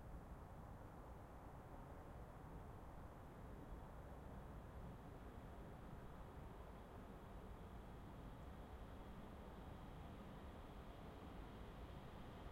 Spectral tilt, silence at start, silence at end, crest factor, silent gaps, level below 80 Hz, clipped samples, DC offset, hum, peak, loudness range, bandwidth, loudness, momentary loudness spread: -7 dB/octave; 0 s; 0 s; 14 dB; none; -60 dBFS; under 0.1%; under 0.1%; none; -44 dBFS; 1 LU; 16 kHz; -58 LUFS; 2 LU